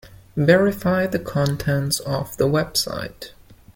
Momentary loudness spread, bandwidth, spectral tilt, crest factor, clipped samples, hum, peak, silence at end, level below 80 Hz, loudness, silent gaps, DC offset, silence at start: 15 LU; 17 kHz; -5 dB/octave; 18 dB; under 0.1%; none; -2 dBFS; 0.2 s; -46 dBFS; -21 LUFS; none; under 0.1%; 0.05 s